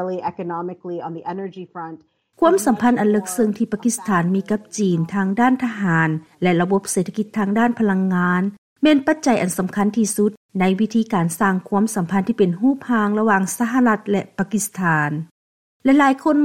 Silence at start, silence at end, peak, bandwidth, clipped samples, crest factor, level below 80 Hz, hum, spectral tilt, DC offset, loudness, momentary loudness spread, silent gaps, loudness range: 0 s; 0 s; -4 dBFS; 16.5 kHz; under 0.1%; 16 dB; -60 dBFS; none; -5.5 dB/octave; under 0.1%; -19 LUFS; 11 LU; 8.58-8.76 s, 10.37-10.49 s, 15.31-15.80 s; 1 LU